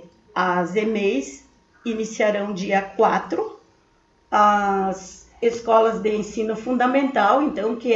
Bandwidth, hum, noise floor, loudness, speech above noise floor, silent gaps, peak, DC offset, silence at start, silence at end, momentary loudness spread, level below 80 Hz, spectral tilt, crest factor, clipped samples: 8 kHz; none; -60 dBFS; -21 LUFS; 39 dB; none; -4 dBFS; under 0.1%; 0 s; 0 s; 10 LU; -58 dBFS; -5 dB/octave; 18 dB; under 0.1%